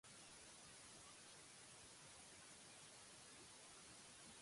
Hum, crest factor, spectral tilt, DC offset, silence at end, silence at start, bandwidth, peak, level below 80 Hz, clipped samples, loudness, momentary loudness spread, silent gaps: none; 14 dB; -1.5 dB/octave; under 0.1%; 0 s; 0.05 s; 11.5 kHz; -50 dBFS; -84 dBFS; under 0.1%; -60 LUFS; 0 LU; none